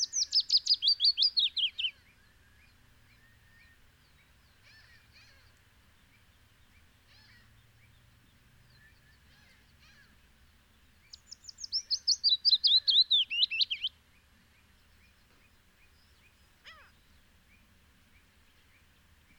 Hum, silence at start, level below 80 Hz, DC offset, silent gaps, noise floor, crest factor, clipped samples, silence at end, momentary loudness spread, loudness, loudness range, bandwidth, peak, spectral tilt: none; 0 s; -68 dBFS; under 0.1%; none; -64 dBFS; 20 dB; under 0.1%; 2.65 s; 14 LU; -25 LUFS; 14 LU; 19.5 kHz; -16 dBFS; 2.5 dB/octave